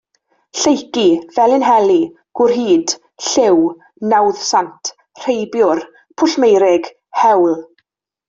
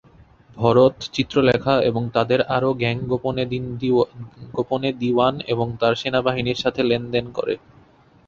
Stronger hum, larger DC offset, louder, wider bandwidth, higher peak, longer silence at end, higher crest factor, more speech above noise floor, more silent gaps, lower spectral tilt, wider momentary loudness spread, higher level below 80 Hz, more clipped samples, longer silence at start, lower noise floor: neither; neither; first, -14 LUFS vs -21 LUFS; about the same, 7.8 kHz vs 7.4 kHz; about the same, -2 dBFS vs -2 dBFS; about the same, 0.65 s vs 0.7 s; second, 12 dB vs 18 dB; first, 51 dB vs 32 dB; neither; second, -3.5 dB/octave vs -6.5 dB/octave; first, 12 LU vs 8 LU; second, -60 dBFS vs -50 dBFS; neither; about the same, 0.55 s vs 0.55 s; first, -64 dBFS vs -52 dBFS